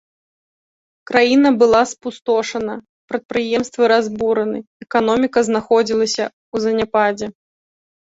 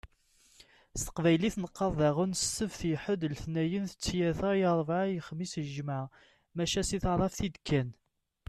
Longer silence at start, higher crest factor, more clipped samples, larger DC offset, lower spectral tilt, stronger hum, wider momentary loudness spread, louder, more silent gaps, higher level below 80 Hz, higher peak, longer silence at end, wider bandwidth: first, 1.1 s vs 0.05 s; about the same, 18 dB vs 16 dB; neither; neither; about the same, -4 dB/octave vs -5 dB/octave; neither; first, 14 LU vs 9 LU; first, -17 LUFS vs -32 LUFS; first, 2.89-3.08 s, 3.25-3.29 s, 4.67-4.80 s, 6.33-6.52 s vs none; second, -56 dBFS vs -50 dBFS; first, 0 dBFS vs -16 dBFS; first, 0.8 s vs 0.55 s; second, 8 kHz vs 13.5 kHz